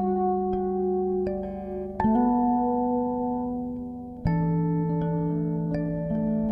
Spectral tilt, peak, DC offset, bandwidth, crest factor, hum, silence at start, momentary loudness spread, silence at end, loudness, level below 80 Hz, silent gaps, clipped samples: -12 dB/octave; -12 dBFS; under 0.1%; 5.2 kHz; 14 dB; none; 0 s; 9 LU; 0 s; -27 LUFS; -46 dBFS; none; under 0.1%